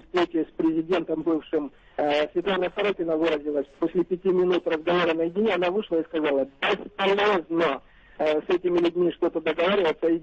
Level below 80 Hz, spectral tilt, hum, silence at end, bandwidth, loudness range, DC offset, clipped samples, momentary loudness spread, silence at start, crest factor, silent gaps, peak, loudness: -58 dBFS; -6.5 dB/octave; none; 0 s; 7.4 kHz; 2 LU; under 0.1%; under 0.1%; 5 LU; 0.15 s; 12 dB; none; -14 dBFS; -25 LUFS